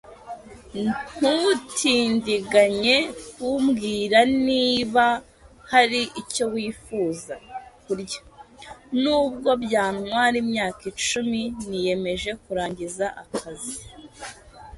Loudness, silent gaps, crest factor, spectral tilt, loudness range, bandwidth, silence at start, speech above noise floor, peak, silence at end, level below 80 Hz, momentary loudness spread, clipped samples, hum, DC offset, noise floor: -23 LUFS; none; 22 dB; -3.5 dB/octave; 7 LU; 11.5 kHz; 0.05 s; 22 dB; -2 dBFS; 0 s; -54 dBFS; 18 LU; under 0.1%; none; under 0.1%; -45 dBFS